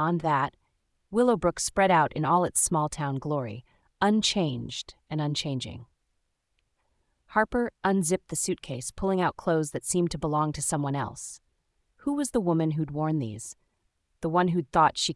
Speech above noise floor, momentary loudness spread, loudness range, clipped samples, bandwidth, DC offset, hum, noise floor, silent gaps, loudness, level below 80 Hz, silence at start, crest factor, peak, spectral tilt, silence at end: 49 dB; 12 LU; 5 LU; under 0.1%; 12 kHz; under 0.1%; none; -76 dBFS; none; -27 LUFS; -54 dBFS; 0 s; 18 dB; -10 dBFS; -4.5 dB/octave; 0 s